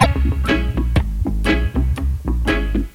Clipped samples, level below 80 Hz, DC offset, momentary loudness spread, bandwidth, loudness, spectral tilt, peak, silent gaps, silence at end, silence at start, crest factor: under 0.1%; -20 dBFS; under 0.1%; 4 LU; 13 kHz; -20 LUFS; -6.5 dB/octave; 0 dBFS; none; 0.05 s; 0 s; 18 dB